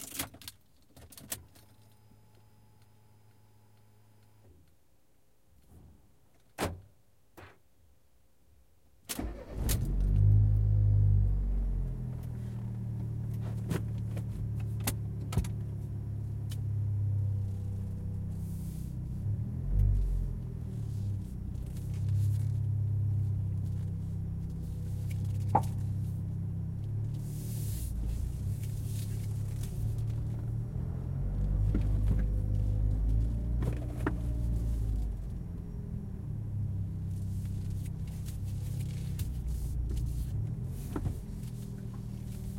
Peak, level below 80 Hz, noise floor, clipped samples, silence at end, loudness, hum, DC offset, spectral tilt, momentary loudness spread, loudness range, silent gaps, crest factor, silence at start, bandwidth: -12 dBFS; -38 dBFS; -70 dBFS; under 0.1%; 0 s; -35 LUFS; none; under 0.1%; -7 dB/octave; 10 LU; 15 LU; none; 20 dB; 0 s; 16.5 kHz